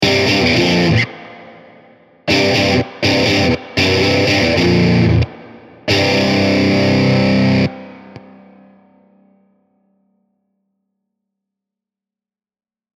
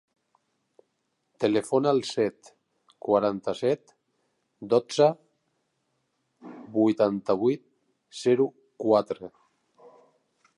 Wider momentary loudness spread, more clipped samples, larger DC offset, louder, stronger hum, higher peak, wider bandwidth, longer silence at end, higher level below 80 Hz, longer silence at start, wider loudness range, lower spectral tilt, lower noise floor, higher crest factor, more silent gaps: second, 9 LU vs 15 LU; neither; neither; first, -13 LUFS vs -26 LUFS; neither; first, -2 dBFS vs -8 dBFS; first, 15 kHz vs 11.5 kHz; first, 4.8 s vs 1.3 s; first, -38 dBFS vs -72 dBFS; second, 0 s vs 1.4 s; about the same, 5 LU vs 3 LU; about the same, -5.5 dB/octave vs -6 dB/octave; first, under -90 dBFS vs -77 dBFS; about the same, 16 dB vs 20 dB; neither